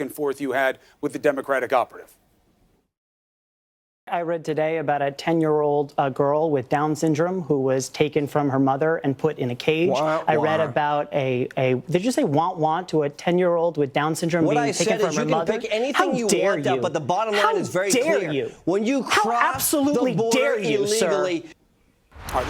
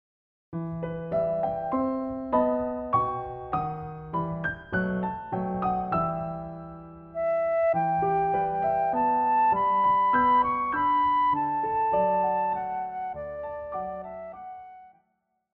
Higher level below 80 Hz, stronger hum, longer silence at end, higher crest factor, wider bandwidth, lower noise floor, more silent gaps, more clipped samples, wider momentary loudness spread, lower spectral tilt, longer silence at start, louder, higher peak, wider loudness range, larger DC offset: about the same, -56 dBFS vs -54 dBFS; neither; second, 0 s vs 0.65 s; about the same, 20 dB vs 16 dB; first, 19 kHz vs 4.8 kHz; second, -63 dBFS vs -75 dBFS; first, 2.98-4.07 s vs none; neither; second, 5 LU vs 15 LU; second, -5 dB/octave vs -9.5 dB/octave; second, 0 s vs 0.5 s; first, -22 LUFS vs -26 LUFS; first, -2 dBFS vs -12 dBFS; about the same, 6 LU vs 7 LU; neither